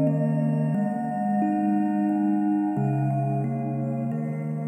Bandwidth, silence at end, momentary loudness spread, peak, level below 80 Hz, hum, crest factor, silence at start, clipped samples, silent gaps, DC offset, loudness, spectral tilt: 9 kHz; 0 s; 5 LU; -12 dBFS; -78 dBFS; none; 12 dB; 0 s; under 0.1%; none; under 0.1%; -25 LUFS; -11 dB/octave